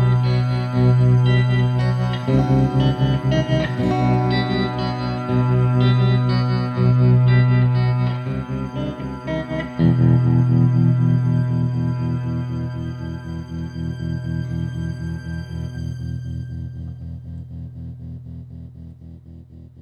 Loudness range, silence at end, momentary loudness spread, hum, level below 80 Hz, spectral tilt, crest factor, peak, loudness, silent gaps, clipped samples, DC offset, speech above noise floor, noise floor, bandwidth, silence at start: 13 LU; 0.15 s; 18 LU; none; -38 dBFS; -8.5 dB/octave; 14 dB; -4 dBFS; -19 LUFS; none; under 0.1%; under 0.1%; 23 dB; -40 dBFS; 6.6 kHz; 0 s